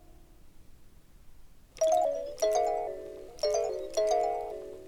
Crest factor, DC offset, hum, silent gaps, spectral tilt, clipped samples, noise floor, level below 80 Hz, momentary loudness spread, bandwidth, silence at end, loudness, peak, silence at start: 16 dB; under 0.1%; none; none; -2.5 dB/octave; under 0.1%; -53 dBFS; -56 dBFS; 12 LU; 16.5 kHz; 0 s; -30 LUFS; -16 dBFS; 0.1 s